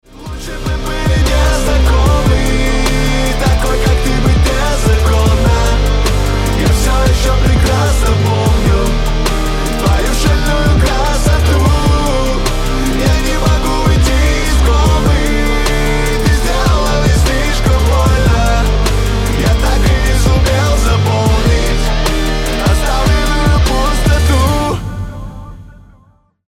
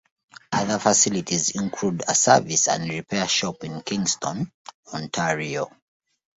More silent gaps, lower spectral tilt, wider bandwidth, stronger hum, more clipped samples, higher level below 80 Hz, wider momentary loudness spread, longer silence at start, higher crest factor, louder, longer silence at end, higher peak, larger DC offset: second, none vs 4.54-4.65 s, 4.74-4.83 s; first, -5 dB/octave vs -2.5 dB/octave; first, 16.5 kHz vs 8.2 kHz; neither; neither; first, -14 dBFS vs -60 dBFS; second, 4 LU vs 14 LU; second, 0.15 s vs 0.5 s; second, 10 dB vs 22 dB; first, -13 LUFS vs -22 LUFS; about the same, 0.75 s vs 0.7 s; about the same, 0 dBFS vs -2 dBFS; neither